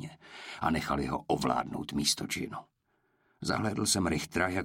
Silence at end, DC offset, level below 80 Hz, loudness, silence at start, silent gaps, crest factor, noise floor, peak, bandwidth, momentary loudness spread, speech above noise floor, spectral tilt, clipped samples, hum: 0 s; under 0.1%; -52 dBFS; -31 LUFS; 0 s; none; 20 dB; -74 dBFS; -14 dBFS; 16.5 kHz; 13 LU; 43 dB; -3.5 dB/octave; under 0.1%; none